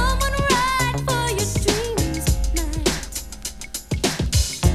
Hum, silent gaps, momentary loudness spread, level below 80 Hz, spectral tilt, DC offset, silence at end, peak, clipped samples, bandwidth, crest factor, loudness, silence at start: none; none; 11 LU; -26 dBFS; -4 dB/octave; under 0.1%; 0 s; -4 dBFS; under 0.1%; 15.5 kHz; 18 dB; -22 LUFS; 0 s